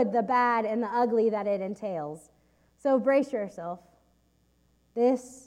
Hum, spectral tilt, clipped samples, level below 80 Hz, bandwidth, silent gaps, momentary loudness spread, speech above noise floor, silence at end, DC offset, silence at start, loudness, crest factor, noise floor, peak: none; -6.5 dB/octave; under 0.1%; -70 dBFS; 12 kHz; none; 15 LU; 40 dB; 0.1 s; under 0.1%; 0 s; -27 LUFS; 16 dB; -67 dBFS; -12 dBFS